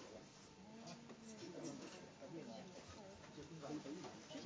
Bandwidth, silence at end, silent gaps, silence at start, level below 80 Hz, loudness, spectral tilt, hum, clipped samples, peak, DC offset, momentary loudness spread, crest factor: 8 kHz; 0 s; none; 0 s; -78 dBFS; -55 LUFS; -4.5 dB/octave; 50 Hz at -70 dBFS; under 0.1%; -38 dBFS; under 0.1%; 7 LU; 16 dB